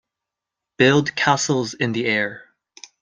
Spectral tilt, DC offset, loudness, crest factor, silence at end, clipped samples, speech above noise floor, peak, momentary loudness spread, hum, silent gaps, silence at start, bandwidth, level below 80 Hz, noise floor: -4 dB/octave; under 0.1%; -19 LUFS; 20 dB; 0.65 s; under 0.1%; 66 dB; -2 dBFS; 6 LU; none; none; 0.8 s; 9.8 kHz; -62 dBFS; -85 dBFS